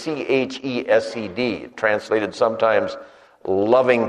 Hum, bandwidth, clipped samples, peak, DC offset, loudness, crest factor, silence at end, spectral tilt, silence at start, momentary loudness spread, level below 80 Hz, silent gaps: none; 10.5 kHz; under 0.1%; -2 dBFS; under 0.1%; -21 LUFS; 18 dB; 0 s; -5.5 dB/octave; 0 s; 10 LU; -62 dBFS; none